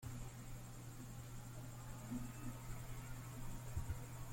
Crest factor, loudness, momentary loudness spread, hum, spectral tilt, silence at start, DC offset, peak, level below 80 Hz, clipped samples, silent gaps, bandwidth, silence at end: 16 dB; -51 LUFS; 5 LU; none; -5.5 dB/octave; 0 s; under 0.1%; -32 dBFS; -54 dBFS; under 0.1%; none; 16.5 kHz; 0 s